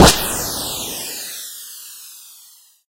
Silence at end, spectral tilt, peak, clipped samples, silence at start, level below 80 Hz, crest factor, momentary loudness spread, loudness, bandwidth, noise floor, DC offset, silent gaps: 0.65 s; -3 dB/octave; 0 dBFS; under 0.1%; 0 s; -32 dBFS; 20 dB; 19 LU; -20 LUFS; 16 kHz; -48 dBFS; under 0.1%; none